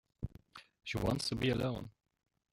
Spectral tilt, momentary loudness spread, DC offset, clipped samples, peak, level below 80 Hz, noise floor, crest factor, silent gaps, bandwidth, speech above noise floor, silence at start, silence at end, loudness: -5.5 dB/octave; 20 LU; under 0.1%; under 0.1%; -20 dBFS; -54 dBFS; -58 dBFS; 18 dB; none; 16.5 kHz; 23 dB; 0.2 s; 0.65 s; -37 LUFS